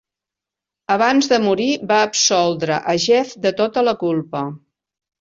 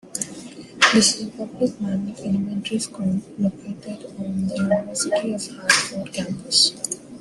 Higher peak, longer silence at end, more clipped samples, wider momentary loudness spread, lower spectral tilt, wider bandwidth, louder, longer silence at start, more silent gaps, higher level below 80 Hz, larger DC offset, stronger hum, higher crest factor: about the same, -2 dBFS vs -2 dBFS; first, 0.65 s vs 0 s; neither; second, 8 LU vs 15 LU; about the same, -3.5 dB/octave vs -3 dB/octave; second, 8 kHz vs 12.5 kHz; first, -17 LUFS vs -21 LUFS; first, 0.9 s vs 0.05 s; neither; about the same, -62 dBFS vs -60 dBFS; neither; neither; second, 16 dB vs 22 dB